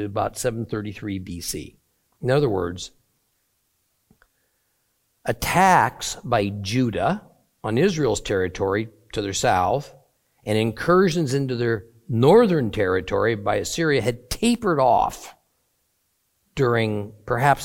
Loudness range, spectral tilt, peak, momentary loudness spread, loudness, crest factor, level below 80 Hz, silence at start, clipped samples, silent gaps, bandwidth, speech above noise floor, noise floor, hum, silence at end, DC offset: 8 LU; -5.5 dB/octave; -2 dBFS; 13 LU; -22 LUFS; 20 dB; -48 dBFS; 0 s; under 0.1%; none; 17 kHz; 49 dB; -70 dBFS; none; 0 s; under 0.1%